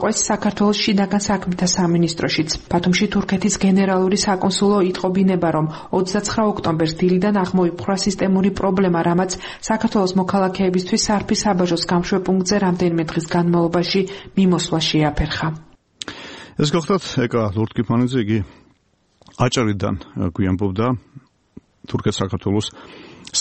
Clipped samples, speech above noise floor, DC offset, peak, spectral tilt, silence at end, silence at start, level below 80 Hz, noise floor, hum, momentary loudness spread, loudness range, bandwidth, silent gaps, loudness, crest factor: under 0.1%; 43 dB; under 0.1%; -2 dBFS; -5 dB/octave; 0 s; 0 s; -42 dBFS; -61 dBFS; none; 6 LU; 5 LU; 8.8 kHz; none; -19 LUFS; 16 dB